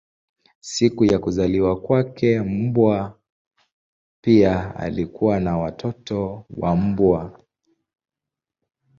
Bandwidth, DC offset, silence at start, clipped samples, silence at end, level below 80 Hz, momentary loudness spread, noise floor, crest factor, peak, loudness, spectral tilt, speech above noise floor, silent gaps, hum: 7.8 kHz; under 0.1%; 0.65 s; under 0.1%; 1.65 s; -44 dBFS; 10 LU; -87 dBFS; 18 dB; -2 dBFS; -21 LUFS; -7 dB/octave; 67 dB; 3.32-3.51 s, 3.72-4.23 s; none